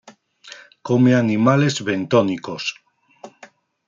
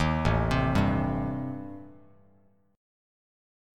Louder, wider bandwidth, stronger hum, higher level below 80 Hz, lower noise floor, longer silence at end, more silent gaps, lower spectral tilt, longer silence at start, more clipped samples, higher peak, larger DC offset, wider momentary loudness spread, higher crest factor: first, -18 LUFS vs -27 LUFS; second, 7.6 kHz vs 12.5 kHz; neither; second, -64 dBFS vs -40 dBFS; second, -48 dBFS vs -64 dBFS; second, 0.6 s vs 0.95 s; neither; second, -6 dB/octave vs -7.5 dB/octave; first, 0.45 s vs 0 s; neither; first, -4 dBFS vs -12 dBFS; neither; first, 23 LU vs 16 LU; about the same, 18 dB vs 18 dB